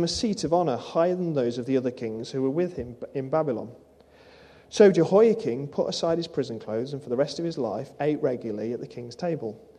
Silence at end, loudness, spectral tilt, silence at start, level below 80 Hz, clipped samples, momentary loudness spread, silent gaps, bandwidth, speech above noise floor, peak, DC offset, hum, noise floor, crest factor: 0.2 s; -26 LUFS; -6 dB/octave; 0 s; -60 dBFS; under 0.1%; 14 LU; none; 10.5 kHz; 28 dB; -4 dBFS; under 0.1%; none; -54 dBFS; 22 dB